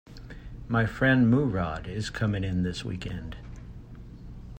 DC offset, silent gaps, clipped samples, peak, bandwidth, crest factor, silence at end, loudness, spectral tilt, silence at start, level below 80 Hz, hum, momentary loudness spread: under 0.1%; none; under 0.1%; -10 dBFS; 15.5 kHz; 18 dB; 0 s; -27 LUFS; -7 dB/octave; 0.1 s; -44 dBFS; none; 24 LU